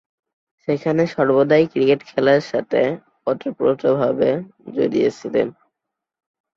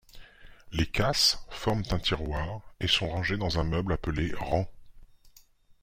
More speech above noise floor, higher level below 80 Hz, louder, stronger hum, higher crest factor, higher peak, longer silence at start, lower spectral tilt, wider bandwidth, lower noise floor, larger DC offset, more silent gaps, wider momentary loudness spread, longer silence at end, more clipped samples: first, 64 dB vs 30 dB; second, -62 dBFS vs -42 dBFS; first, -19 LUFS vs -29 LUFS; neither; about the same, 16 dB vs 20 dB; first, -2 dBFS vs -10 dBFS; first, 0.7 s vs 0.15 s; first, -7 dB/octave vs -4 dB/octave; second, 7.4 kHz vs 16.5 kHz; first, -82 dBFS vs -58 dBFS; neither; neither; about the same, 9 LU vs 10 LU; first, 1.05 s vs 0.55 s; neither